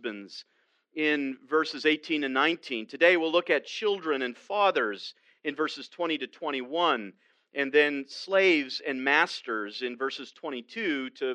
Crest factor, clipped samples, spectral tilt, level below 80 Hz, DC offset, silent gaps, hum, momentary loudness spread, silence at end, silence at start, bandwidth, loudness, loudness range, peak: 20 dB; under 0.1%; -3.5 dB/octave; -90 dBFS; under 0.1%; none; none; 14 LU; 0 s; 0.05 s; 9.6 kHz; -28 LUFS; 4 LU; -8 dBFS